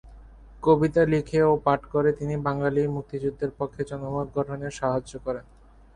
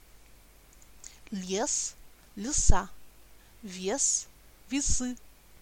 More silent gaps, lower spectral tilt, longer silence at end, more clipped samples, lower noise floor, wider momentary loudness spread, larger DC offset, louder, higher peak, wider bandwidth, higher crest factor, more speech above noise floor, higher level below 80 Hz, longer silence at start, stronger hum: neither; first, -7.5 dB/octave vs -3 dB/octave; about the same, 0.55 s vs 0.45 s; neither; second, -47 dBFS vs -55 dBFS; second, 11 LU vs 22 LU; neither; first, -25 LUFS vs -30 LUFS; about the same, -6 dBFS vs -4 dBFS; second, 10 kHz vs 16 kHz; second, 18 dB vs 26 dB; second, 22 dB vs 29 dB; second, -48 dBFS vs -36 dBFS; second, 0.05 s vs 1.05 s; neither